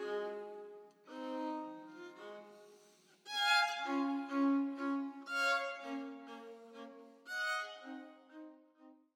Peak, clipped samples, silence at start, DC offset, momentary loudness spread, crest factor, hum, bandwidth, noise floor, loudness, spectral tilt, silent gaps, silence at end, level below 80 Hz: -18 dBFS; under 0.1%; 0 s; under 0.1%; 22 LU; 22 dB; none; 16.5 kHz; -66 dBFS; -37 LUFS; -2 dB/octave; none; 0.2 s; under -90 dBFS